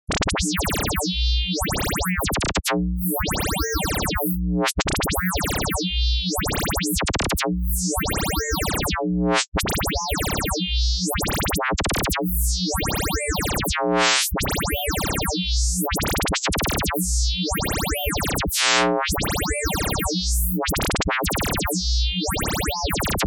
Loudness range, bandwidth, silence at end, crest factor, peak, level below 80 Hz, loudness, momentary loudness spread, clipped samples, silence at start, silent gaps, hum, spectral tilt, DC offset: 1 LU; 19.5 kHz; 0 s; 18 dB; -6 dBFS; -28 dBFS; -22 LUFS; 2 LU; under 0.1%; 0.1 s; 9.48-9.52 s; none; -3.5 dB/octave; under 0.1%